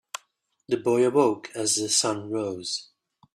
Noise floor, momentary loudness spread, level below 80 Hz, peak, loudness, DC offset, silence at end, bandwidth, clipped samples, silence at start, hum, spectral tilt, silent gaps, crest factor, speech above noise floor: -69 dBFS; 11 LU; -72 dBFS; -8 dBFS; -25 LUFS; under 0.1%; 0.5 s; 14 kHz; under 0.1%; 0.7 s; none; -3 dB/octave; none; 18 dB; 44 dB